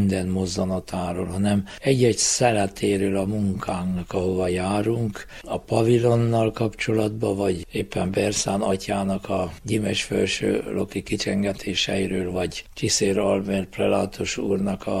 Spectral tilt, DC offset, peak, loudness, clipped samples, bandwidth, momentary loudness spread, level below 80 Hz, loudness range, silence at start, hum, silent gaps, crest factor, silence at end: -5 dB/octave; under 0.1%; -6 dBFS; -23 LUFS; under 0.1%; 15 kHz; 8 LU; -46 dBFS; 2 LU; 0 s; none; none; 18 dB; 0 s